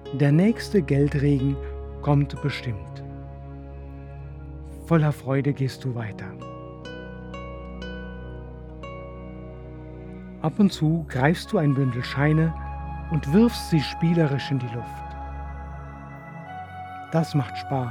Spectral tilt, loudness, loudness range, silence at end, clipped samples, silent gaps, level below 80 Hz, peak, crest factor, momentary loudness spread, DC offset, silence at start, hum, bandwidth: -7.5 dB/octave; -24 LUFS; 13 LU; 0 s; under 0.1%; none; -40 dBFS; -4 dBFS; 22 dB; 18 LU; under 0.1%; 0 s; none; 14.5 kHz